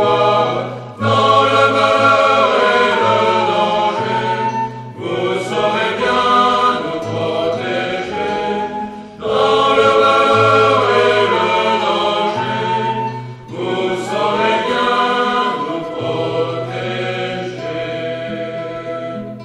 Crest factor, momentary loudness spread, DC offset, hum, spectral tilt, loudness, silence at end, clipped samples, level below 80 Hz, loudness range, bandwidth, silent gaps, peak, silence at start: 14 dB; 12 LU; under 0.1%; none; -5 dB/octave; -15 LUFS; 0 s; under 0.1%; -54 dBFS; 6 LU; 11.5 kHz; none; 0 dBFS; 0 s